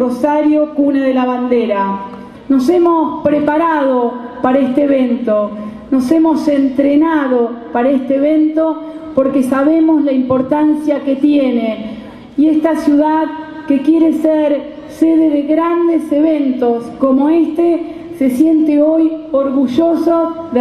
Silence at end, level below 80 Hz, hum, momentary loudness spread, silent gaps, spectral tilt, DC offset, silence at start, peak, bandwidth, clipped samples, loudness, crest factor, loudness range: 0 s; -50 dBFS; none; 7 LU; none; -7 dB/octave; under 0.1%; 0 s; 0 dBFS; 12.5 kHz; under 0.1%; -13 LUFS; 12 dB; 1 LU